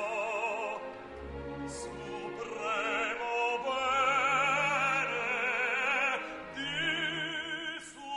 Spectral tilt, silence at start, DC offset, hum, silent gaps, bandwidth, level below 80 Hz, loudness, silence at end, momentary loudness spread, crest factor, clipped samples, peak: -3 dB/octave; 0 s; under 0.1%; none; none; 11.5 kHz; -60 dBFS; -31 LUFS; 0 s; 14 LU; 16 dB; under 0.1%; -18 dBFS